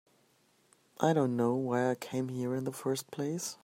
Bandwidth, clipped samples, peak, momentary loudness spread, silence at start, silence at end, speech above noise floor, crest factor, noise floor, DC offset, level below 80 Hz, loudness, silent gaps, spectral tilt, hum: 16 kHz; under 0.1%; -10 dBFS; 7 LU; 1 s; 0.1 s; 37 dB; 22 dB; -69 dBFS; under 0.1%; -78 dBFS; -33 LUFS; none; -6 dB/octave; none